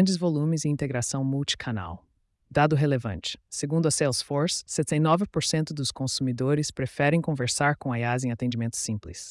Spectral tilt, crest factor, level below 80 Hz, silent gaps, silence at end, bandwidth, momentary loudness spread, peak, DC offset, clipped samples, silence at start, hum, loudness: -5 dB/octave; 18 dB; -56 dBFS; none; 0 s; 12 kHz; 8 LU; -8 dBFS; under 0.1%; under 0.1%; 0 s; none; -26 LUFS